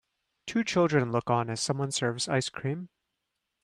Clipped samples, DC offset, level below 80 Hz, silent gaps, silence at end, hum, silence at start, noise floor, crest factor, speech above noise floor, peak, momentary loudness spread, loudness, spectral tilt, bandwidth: under 0.1%; under 0.1%; -68 dBFS; none; 0.8 s; none; 0.45 s; -83 dBFS; 18 dB; 55 dB; -12 dBFS; 11 LU; -29 LUFS; -4.5 dB/octave; 13 kHz